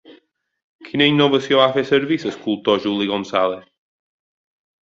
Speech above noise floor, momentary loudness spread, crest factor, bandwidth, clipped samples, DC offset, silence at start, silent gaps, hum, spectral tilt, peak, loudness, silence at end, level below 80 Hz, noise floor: 37 dB; 8 LU; 18 dB; 7.6 kHz; under 0.1%; under 0.1%; 0.1 s; 0.63-0.79 s; none; -6 dB/octave; -2 dBFS; -18 LUFS; 1.3 s; -62 dBFS; -55 dBFS